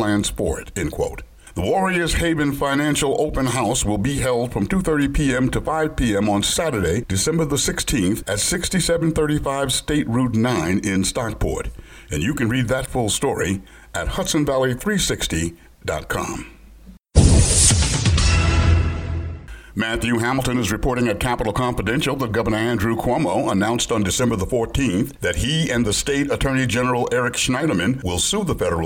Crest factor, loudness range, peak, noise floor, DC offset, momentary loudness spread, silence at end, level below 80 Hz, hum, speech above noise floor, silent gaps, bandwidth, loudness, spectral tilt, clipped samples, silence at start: 20 dB; 4 LU; 0 dBFS; -44 dBFS; under 0.1%; 8 LU; 0 s; -30 dBFS; none; 24 dB; none; 18.5 kHz; -20 LUFS; -4.5 dB/octave; under 0.1%; 0 s